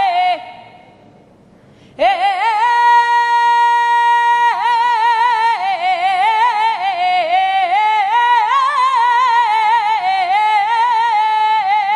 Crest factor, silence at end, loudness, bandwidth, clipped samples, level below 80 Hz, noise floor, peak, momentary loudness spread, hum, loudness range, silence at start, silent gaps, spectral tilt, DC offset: 12 dB; 0 s; -13 LUFS; 10.5 kHz; under 0.1%; -64 dBFS; -46 dBFS; -2 dBFS; 4 LU; none; 2 LU; 0 s; none; -1 dB/octave; under 0.1%